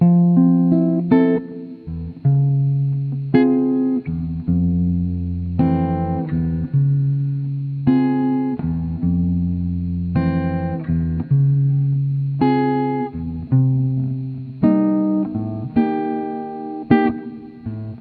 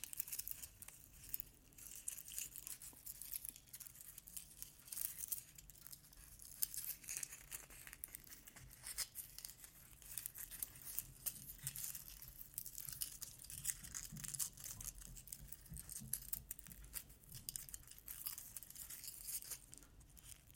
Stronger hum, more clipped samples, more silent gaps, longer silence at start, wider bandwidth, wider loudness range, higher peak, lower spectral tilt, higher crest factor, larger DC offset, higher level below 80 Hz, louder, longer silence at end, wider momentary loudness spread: neither; neither; neither; about the same, 0 s vs 0 s; second, 4.5 kHz vs 17 kHz; about the same, 2 LU vs 3 LU; first, 0 dBFS vs -18 dBFS; first, -12.5 dB/octave vs -0.5 dB/octave; second, 18 dB vs 34 dB; neither; first, -40 dBFS vs -66 dBFS; first, -19 LUFS vs -48 LUFS; about the same, 0 s vs 0 s; about the same, 11 LU vs 12 LU